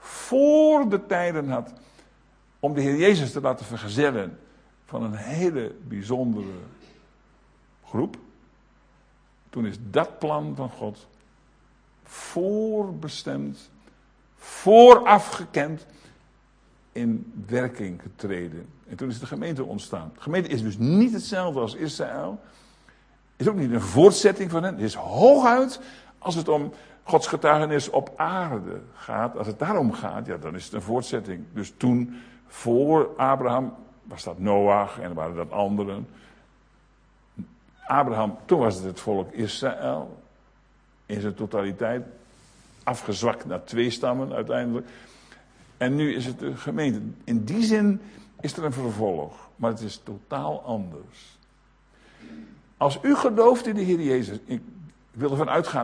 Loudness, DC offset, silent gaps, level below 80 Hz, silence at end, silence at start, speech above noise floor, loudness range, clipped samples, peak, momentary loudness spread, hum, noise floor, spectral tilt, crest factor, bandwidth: -23 LUFS; under 0.1%; none; -60 dBFS; 0 s; 0 s; 36 dB; 13 LU; under 0.1%; 0 dBFS; 17 LU; none; -59 dBFS; -6 dB/octave; 24 dB; 10.5 kHz